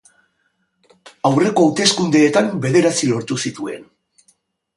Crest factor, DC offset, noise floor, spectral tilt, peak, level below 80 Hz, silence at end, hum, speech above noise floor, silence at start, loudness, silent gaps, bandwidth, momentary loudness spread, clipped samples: 18 dB; under 0.1%; -67 dBFS; -4.5 dB/octave; 0 dBFS; -62 dBFS; 0.95 s; none; 51 dB; 1.05 s; -16 LUFS; none; 11.5 kHz; 12 LU; under 0.1%